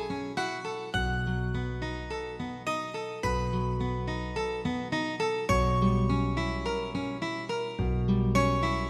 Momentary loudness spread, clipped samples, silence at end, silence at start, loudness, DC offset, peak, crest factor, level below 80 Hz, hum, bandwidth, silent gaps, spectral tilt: 9 LU; under 0.1%; 0 s; 0 s; -30 LUFS; under 0.1%; -12 dBFS; 18 dB; -38 dBFS; none; 13 kHz; none; -6.5 dB/octave